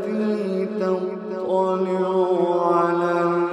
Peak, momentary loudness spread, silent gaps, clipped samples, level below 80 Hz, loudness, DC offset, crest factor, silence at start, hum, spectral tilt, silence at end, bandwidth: -6 dBFS; 5 LU; none; under 0.1%; -78 dBFS; -22 LUFS; under 0.1%; 14 dB; 0 s; none; -8 dB/octave; 0 s; 9.8 kHz